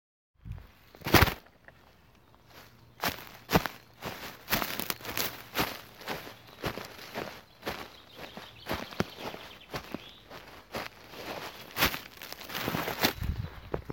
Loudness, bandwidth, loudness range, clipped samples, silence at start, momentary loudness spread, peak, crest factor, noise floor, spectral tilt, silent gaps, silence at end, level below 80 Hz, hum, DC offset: -33 LUFS; 17 kHz; 9 LU; under 0.1%; 0.45 s; 18 LU; -2 dBFS; 32 dB; -60 dBFS; -4 dB/octave; none; 0 s; -48 dBFS; none; under 0.1%